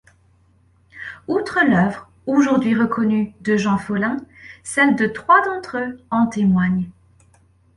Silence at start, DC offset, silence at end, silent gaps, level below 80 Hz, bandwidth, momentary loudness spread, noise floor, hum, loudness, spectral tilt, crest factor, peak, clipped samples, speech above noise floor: 0.95 s; under 0.1%; 0.85 s; none; -54 dBFS; 11.5 kHz; 14 LU; -56 dBFS; none; -19 LUFS; -6.5 dB/octave; 18 dB; -2 dBFS; under 0.1%; 38 dB